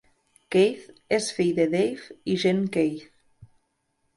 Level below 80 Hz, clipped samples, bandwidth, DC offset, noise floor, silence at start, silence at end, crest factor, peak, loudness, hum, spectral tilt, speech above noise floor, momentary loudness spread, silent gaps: -64 dBFS; under 0.1%; 11.5 kHz; under 0.1%; -74 dBFS; 0.5 s; 0.7 s; 16 dB; -10 dBFS; -25 LUFS; none; -5.5 dB/octave; 50 dB; 9 LU; none